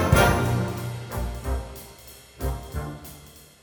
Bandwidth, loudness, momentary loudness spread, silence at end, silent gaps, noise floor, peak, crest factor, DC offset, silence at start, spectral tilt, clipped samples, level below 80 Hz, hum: over 20 kHz; -27 LUFS; 24 LU; 0.15 s; none; -48 dBFS; -4 dBFS; 22 dB; under 0.1%; 0 s; -5.5 dB/octave; under 0.1%; -34 dBFS; none